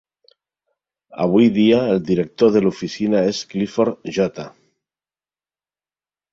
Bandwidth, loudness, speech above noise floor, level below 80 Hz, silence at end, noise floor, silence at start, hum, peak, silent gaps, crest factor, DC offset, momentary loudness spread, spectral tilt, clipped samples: 7.8 kHz; -18 LUFS; over 73 dB; -56 dBFS; 1.85 s; under -90 dBFS; 1.15 s; none; -2 dBFS; none; 18 dB; under 0.1%; 9 LU; -6.5 dB/octave; under 0.1%